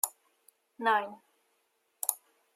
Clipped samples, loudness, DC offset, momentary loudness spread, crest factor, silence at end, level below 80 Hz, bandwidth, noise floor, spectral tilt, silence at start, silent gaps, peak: under 0.1%; -32 LUFS; under 0.1%; 15 LU; 30 dB; 0.4 s; under -90 dBFS; 16 kHz; -76 dBFS; -0.5 dB/octave; 0.05 s; none; -6 dBFS